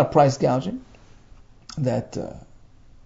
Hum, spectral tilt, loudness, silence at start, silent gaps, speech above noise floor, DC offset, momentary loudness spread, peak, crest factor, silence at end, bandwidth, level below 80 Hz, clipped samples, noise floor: none; -7 dB/octave; -23 LUFS; 0 s; none; 27 dB; under 0.1%; 20 LU; -4 dBFS; 20 dB; 0.65 s; 7.8 kHz; -50 dBFS; under 0.1%; -48 dBFS